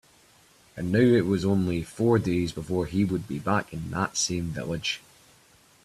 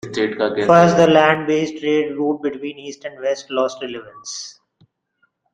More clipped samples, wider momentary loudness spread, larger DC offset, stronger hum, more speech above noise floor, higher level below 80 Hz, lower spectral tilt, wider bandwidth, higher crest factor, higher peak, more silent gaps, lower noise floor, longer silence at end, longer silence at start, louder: neither; second, 10 LU vs 19 LU; neither; neither; second, 33 dB vs 49 dB; about the same, -54 dBFS vs -58 dBFS; about the same, -5.5 dB/octave vs -5.5 dB/octave; first, 14 kHz vs 9.6 kHz; about the same, 18 dB vs 18 dB; second, -10 dBFS vs -2 dBFS; neither; second, -58 dBFS vs -66 dBFS; second, 0.85 s vs 1 s; first, 0.75 s vs 0.05 s; second, -26 LUFS vs -17 LUFS